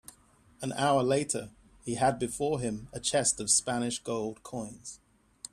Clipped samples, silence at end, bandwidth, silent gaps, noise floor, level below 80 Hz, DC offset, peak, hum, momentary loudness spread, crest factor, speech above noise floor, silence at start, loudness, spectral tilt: under 0.1%; 0.55 s; 14.5 kHz; none; -62 dBFS; -60 dBFS; under 0.1%; -12 dBFS; none; 17 LU; 18 dB; 31 dB; 0.6 s; -30 LUFS; -3.5 dB/octave